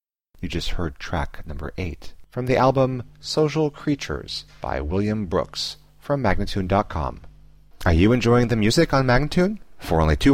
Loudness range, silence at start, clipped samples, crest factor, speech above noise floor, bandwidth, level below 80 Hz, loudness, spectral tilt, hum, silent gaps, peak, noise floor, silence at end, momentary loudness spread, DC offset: 5 LU; 0.35 s; under 0.1%; 16 dB; 28 dB; 16 kHz; -32 dBFS; -22 LUFS; -6 dB/octave; none; none; -6 dBFS; -49 dBFS; 0 s; 14 LU; 0.5%